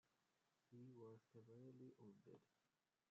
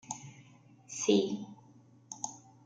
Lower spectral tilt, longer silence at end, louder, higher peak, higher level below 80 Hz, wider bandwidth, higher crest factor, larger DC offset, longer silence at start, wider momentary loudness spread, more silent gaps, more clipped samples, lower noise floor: first, -8.5 dB/octave vs -4 dB/octave; first, 0.45 s vs 0.3 s; second, -65 LUFS vs -34 LUFS; second, -52 dBFS vs -14 dBFS; second, under -90 dBFS vs -80 dBFS; second, 7 kHz vs 9.6 kHz; second, 14 dB vs 22 dB; neither; about the same, 0.05 s vs 0.1 s; second, 5 LU vs 21 LU; neither; neither; first, -88 dBFS vs -60 dBFS